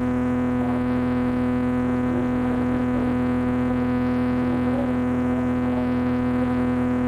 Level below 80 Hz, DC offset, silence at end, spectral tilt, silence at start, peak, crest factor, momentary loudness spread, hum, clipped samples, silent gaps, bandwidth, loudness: -40 dBFS; under 0.1%; 0 s; -8.5 dB/octave; 0 s; -14 dBFS; 8 dB; 1 LU; none; under 0.1%; none; 5 kHz; -23 LUFS